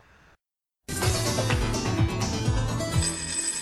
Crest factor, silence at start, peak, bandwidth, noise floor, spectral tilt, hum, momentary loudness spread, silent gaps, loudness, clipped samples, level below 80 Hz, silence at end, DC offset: 14 dB; 0.9 s; -12 dBFS; 13.5 kHz; -83 dBFS; -4 dB/octave; none; 3 LU; none; -26 LUFS; under 0.1%; -36 dBFS; 0 s; under 0.1%